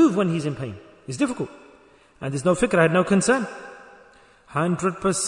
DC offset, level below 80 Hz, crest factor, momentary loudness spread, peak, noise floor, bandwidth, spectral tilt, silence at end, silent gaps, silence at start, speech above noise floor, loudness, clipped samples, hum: under 0.1%; -54 dBFS; 18 dB; 17 LU; -4 dBFS; -53 dBFS; 11 kHz; -5.5 dB/octave; 0 s; none; 0 s; 31 dB; -23 LUFS; under 0.1%; none